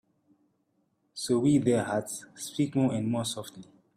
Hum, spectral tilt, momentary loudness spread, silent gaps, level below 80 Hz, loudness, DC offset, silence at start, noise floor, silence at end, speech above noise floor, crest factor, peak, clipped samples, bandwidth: none; -5.5 dB/octave; 15 LU; none; -66 dBFS; -29 LUFS; under 0.1%; 1.15 s; -74 dBFS; 0.35 s; 46 dB; 18 dB; -12 dBFS; under 0.1%; 15 kHz